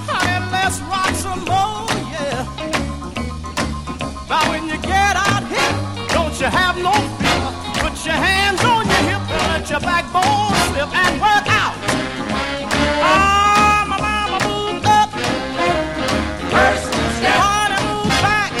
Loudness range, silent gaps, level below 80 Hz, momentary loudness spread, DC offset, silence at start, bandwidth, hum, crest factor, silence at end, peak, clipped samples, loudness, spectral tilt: 5 LU; none; -34 dBFS; 8 LU; 0.4%; 0 s; 16 kHz; none; 16 dB; 0 s; -2 dBFS; under 0.1%; -17 LUFS; -3.5 dB/octave